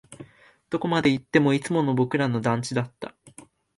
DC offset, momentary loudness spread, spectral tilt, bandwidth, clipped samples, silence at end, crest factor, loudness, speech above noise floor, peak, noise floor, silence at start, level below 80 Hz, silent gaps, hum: under 0.1%; 12 LU; -6 dB/octave; 11.5 kHz; under 0.1%; 0.35 s; 20 dB; -24 LUFS; 27 dB; -6 dBFS; -51 dBFS; 0.1 s; -62 dBFS; none; none